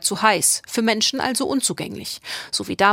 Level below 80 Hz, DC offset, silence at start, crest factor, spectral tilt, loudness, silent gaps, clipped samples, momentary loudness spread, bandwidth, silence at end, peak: -60 dBFS; under 0.1%; 0 s; 20 dB; -2 dB/octave; -20 LUFS; none; under 0.1%; 12 LU; 16.5 kHz; 0 s; -2 dBFS